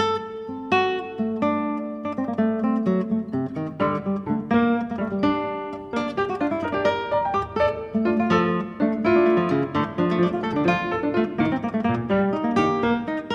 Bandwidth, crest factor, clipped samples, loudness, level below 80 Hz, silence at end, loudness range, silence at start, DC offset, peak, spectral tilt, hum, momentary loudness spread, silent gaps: 7.6 kHz; 16 dB; under 0.1%; -23 LUFS; -52 dBFS; 0 s; 3 LU; 0 s; under 0.1%; -6 dBFS; -7.5 dB/octave; none; 7 LU; none